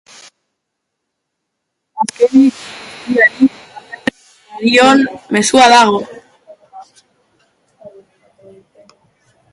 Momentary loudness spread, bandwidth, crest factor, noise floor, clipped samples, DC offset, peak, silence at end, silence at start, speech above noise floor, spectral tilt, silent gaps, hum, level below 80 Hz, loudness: 22 LU; 11.5 kHz; 16 dB; -75 dBFS; under 0.1%; under 0.1%; 0 dBFS; 1.65 s; 1.95 s; 65 dB; -3 dB/octave; none; none; -58 dBFS; -11 LUFS